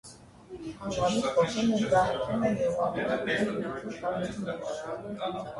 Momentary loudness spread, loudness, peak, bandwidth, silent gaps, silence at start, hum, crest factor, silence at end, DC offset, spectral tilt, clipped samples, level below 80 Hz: 12 LU; -29 LUFS; -12 dBFS; 11.5 kHz; none; 0.05 s; none; 16 dB; 0 s; under 0.1%; -5.5 dB/octave; under 0.1%; -56 dBFS